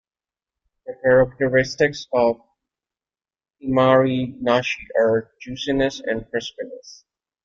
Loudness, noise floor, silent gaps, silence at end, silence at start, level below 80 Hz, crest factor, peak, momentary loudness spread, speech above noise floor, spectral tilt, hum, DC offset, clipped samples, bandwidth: -20 LUFS; under -90 dBFS; none; 0.5 s; 0.85 s; -50 dBFS; 18 dB; -4 dBFS; 18 LU; over 70 dB; -5.5 dB/octave; none; under 0.1%; under 0.1%; 7.6 kHz